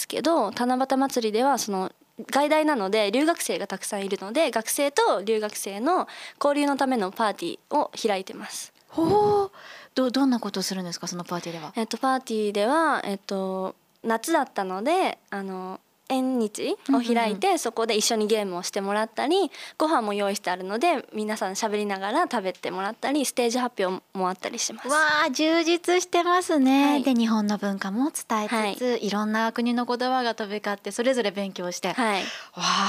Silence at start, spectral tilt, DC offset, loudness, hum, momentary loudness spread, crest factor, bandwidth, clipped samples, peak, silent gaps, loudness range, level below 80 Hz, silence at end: 0 s; -3.5 dB/octave; under 0.1%; -25 LUFS; none; 9 LU; 16 dB; 15.5 kHz; under 0.1%; -8 dBFS; none; 4 LU; -74 dBFS; 0 s